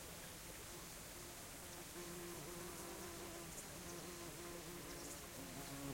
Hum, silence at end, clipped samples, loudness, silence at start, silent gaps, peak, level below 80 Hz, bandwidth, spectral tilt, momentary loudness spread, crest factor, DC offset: none; 0 s; under 0.1%; -51 LUFS; 0 s; none; -34 dBFS; -66 dBFS; 16.5 kHz; -3 dB/octave; 2 LU; 18 dB; under 0.1%